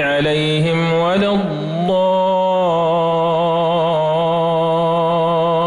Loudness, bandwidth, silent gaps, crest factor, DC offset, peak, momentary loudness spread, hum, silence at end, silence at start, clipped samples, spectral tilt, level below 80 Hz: -16 LUFS; 11 kHz; none; 8 dB; under 0.1%; -8 dBFS; 1 LU; none; 0 s; 0 s; under 0.1%; -7 dB/octave; -50 dBFS